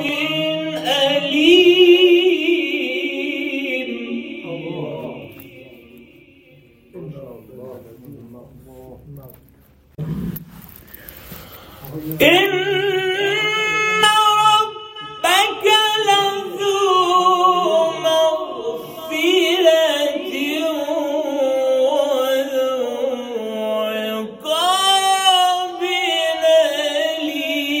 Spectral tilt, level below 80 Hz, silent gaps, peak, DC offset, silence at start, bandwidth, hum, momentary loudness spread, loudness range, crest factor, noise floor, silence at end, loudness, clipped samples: -3 dB/octave; -54 dBFS; none; 0 dBFS; under 0.1%; 0 s; 16.5 kHz; none; 19 LU; 18 LU; 18 dB; -51 dBFS; 0 s; -16 LUFS; under 0.1%